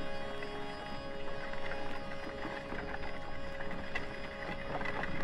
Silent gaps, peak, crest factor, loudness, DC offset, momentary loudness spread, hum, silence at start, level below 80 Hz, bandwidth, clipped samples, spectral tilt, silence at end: none; -20 dBFS; 18 dB; -41 LUFS; under 0.1%; 5 LU; none; 0 s; -46 dBFS; 10 kHz; under 0.1%; -5.5 dB/octave; 0 s